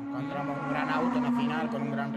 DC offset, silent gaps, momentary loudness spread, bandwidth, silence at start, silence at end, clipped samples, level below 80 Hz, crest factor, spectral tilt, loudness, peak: under 0.1%; none; 6 LU; 9.2 kHz; 0 s; 0 s; under 0.1%; -64 dBFS; 16 dB; -7 dB/octave; -30 LUFS; -14 dBFS